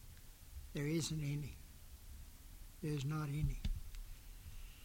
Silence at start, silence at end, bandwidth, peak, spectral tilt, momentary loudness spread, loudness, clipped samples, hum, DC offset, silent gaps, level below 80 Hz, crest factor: 0 s; 0 s; 17 kHz; -26 dBFS; -5.5 dB/octave; 19 LU; -43 LUFS; under 0.1%; none; under 0.1%; none; -50 dBFS; 18 dB